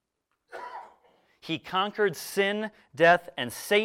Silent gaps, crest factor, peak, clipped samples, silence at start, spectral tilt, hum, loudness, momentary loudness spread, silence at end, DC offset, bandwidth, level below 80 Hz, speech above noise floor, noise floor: none; 20 dB; -8 dBFS; under 0.1%; 0.55 s; -3.5 dB/octave; none; -26 LUFS; 22 LU; 0 s; under 0.1%; 16.5 kHz; -72 dBFS; 52 dB; -78 dBFS